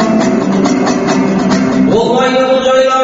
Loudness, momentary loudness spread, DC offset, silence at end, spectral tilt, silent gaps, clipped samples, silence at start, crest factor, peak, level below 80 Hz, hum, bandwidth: -11 LUFS; 2 LU; under 0.1%; 0 s; -5 dB/octave; none; under 0.1%; 0 s; 10 dB; 0 dBFS; -42 dBFS; none; 8 kHz